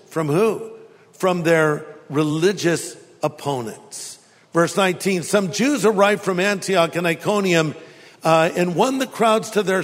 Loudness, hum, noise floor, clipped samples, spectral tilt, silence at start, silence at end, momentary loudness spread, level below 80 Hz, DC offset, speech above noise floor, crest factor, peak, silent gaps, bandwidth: -19 LUFS; none; -43 dBFS; under 0.1%; -5 dB/octave; 0.1 s; 0 s; 11 LU; -66 dBFS; under 0.1%; 24 dB; 18 dB; -2 dBFS; none; 16 kHz